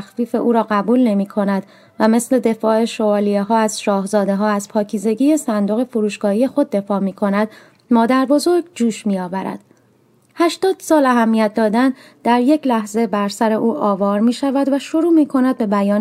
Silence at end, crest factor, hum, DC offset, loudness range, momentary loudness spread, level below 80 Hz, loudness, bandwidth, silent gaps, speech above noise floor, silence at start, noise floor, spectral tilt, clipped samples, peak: 0 s; 16 dB; none; under 0.1%; 2 LU; 6 LU; -64 dBFS; -17 LUFS; 15 kHz; none; 39 dB; 0 s; -55 dBFS; -5.5 dB/octave; under 0.1%; 0 dBFS